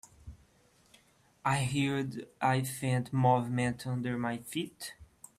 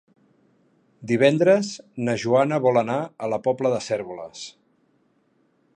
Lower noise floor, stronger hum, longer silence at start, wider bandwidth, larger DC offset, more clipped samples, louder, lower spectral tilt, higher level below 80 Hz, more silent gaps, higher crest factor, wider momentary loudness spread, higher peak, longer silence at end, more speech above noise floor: about the same, -66 dBFS vs -65 dBFS; neither; second, 0.25 s vs 1 s; first, 15 kHz vs 9.8 kHz; neither; neither; second, -32 LUFS vs -22 LUFS; about the same, -5.5 dB/octave vs -6 dB/octave; first, -62 dBFS vs -68 dBFS; neither; about the same, 20 dB vs 20 dB; second, 14 LU vs 17 LU; second, -14 dBFS vs -4 dBFS; second, 0.35 s vs 1.25 s; second, 34 dB vs 43 dB